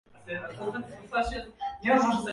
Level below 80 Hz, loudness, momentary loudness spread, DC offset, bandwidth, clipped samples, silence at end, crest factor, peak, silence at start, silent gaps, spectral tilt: -50 dBFS; -30 LUFS; 14 LU; under 0.1%; 11.5 kHz; under 0.1%; 0 s; 20 dB; -10 dBFS; 0.15 s; none; -5 dB/octave